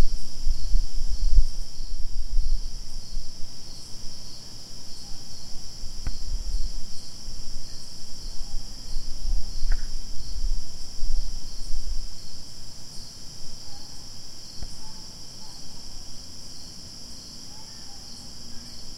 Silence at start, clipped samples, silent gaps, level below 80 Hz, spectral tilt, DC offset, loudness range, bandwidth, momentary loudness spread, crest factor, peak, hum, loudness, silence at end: 0 s; under 0.1%; none; -28 dBFS; -3 dB/octave; under 0.1%; 7 LU; 11 kHz; 8 LU; 18 dB; -2 dBFS; none; -36 LUFS; 0 s